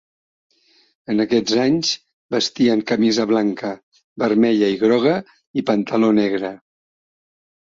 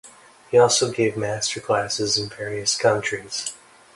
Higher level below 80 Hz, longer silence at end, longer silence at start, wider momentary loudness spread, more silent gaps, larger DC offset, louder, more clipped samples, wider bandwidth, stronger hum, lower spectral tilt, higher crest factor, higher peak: about the same, -62 dBFS vs -58 dBFS; first, 1.1 s vs 0.4 s; first, 1.1 s vs 0.05 s; about the same, 11 LU vs 11 LU; first, 2.13-2.29 s, 3.83-3.92 s, 4.04-4.16 s, 5.47-5.54 s vs none; neither; about the same, -19 LUFS vs -21 LUFS; neither; second, 7.6 kHz vs 11.5 kHz; neither; first, -5 dB/octave vs -3 dB/octave; about the same, 16 dB vs 18 dB; about the same, -4 dBFS vs -4 dBFS